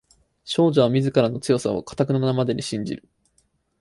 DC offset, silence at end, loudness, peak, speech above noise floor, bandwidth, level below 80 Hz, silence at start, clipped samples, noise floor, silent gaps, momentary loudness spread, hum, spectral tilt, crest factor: under 0.1%; 0.85 s; -22 LUFS; -4 dBFS; 45 dB; 11.5 kHz; -56 dBFS; 0.45 s; under 0.1%; -66 dBFS; none; 10 LU; none; -6.5 dB/octave; 18 dB